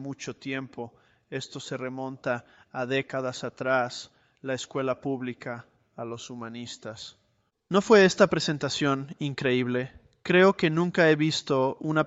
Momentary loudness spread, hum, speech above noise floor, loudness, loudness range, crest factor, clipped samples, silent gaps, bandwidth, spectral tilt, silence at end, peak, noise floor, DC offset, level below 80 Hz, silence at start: 19 LU; none; 45 dB; -26 LUFS; 10 LU; 20 dB; under 0.1%; none; 8.2 kHz; -5 dB/octave; 0 s; -6 dBFS; -72 dBFS; under 0.1%; -66 dBFS; 0 s